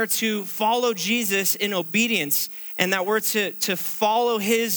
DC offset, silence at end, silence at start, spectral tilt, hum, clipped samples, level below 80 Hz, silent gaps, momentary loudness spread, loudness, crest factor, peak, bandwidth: under 0.1%; 0 s; 0 s; -2.5 dB/octave; none; under 0.1%; -78 dBFS; none; 3 LU; -22 LUFS; 20 dB; -2 dBFS; over 20 kHz